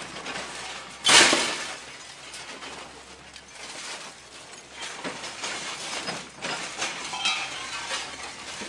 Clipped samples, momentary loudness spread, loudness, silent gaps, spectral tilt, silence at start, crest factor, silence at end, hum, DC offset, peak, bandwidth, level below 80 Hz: under 0.1%; 22 LU; -25 LUFS; none; 0 dB/octave; 0 s; 28 dB; 0 s; none; under 0.1%; -2 dBFS; 11.5 kHz; -64 dBFS